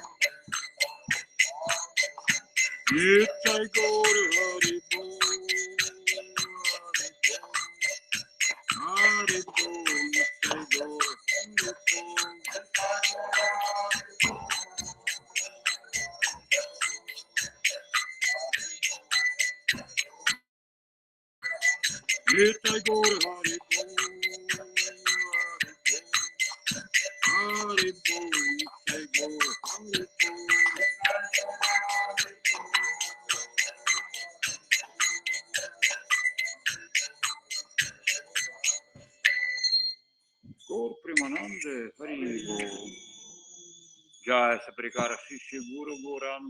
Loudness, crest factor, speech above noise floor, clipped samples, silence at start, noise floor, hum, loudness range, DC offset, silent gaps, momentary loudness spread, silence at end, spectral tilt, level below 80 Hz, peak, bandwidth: -27 LUFS; 28 dB; 42 dB; under 0.1%; 0 s; -66 dBFS; none; 5 LU; under 0.1%; 20.49-21.42 s; 11 LU; 0 s; -0.5 dB/octave; -70 dBFS; -2 dBFS; 16.5 kHz